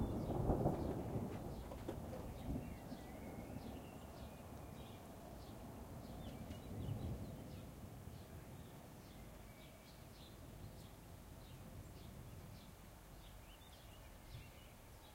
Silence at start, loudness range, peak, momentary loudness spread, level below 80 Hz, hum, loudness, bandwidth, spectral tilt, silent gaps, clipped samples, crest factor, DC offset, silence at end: 0 s; 11 LU; -24 dBFS; 15 LU; -56 dBFS; none; -50 LUFS; 16 kHz; -7 dB/octave; none; under 0.1%; 24 dB; under 0.1%; 0 s